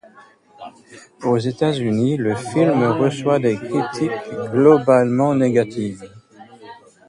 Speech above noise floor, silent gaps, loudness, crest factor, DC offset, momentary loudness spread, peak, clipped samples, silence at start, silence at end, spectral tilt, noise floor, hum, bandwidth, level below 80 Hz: 31 dB; none; -18 LUFS; 18 dB; under 0.1%; 12 LU; 0 dBFS; under 0.1%; 0.6 s; 0.35 s; -7 dB/octave; -48 dBFS; none; 11.5 kHz; -58 dBFS